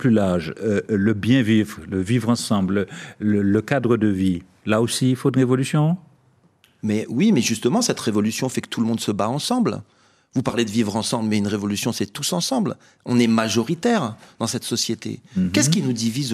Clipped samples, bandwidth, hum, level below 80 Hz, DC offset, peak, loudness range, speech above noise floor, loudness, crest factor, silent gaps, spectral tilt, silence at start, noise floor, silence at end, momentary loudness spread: under 0.1%; 14.5 kHz; none; -62 dBFS; under 0.1%; -2 dBFS; 2 LU; 38 dB; -21 LUFS; 18 dB; none; -5 dB/octave; 0 s; -58 dBFS; 0 s; 8 LU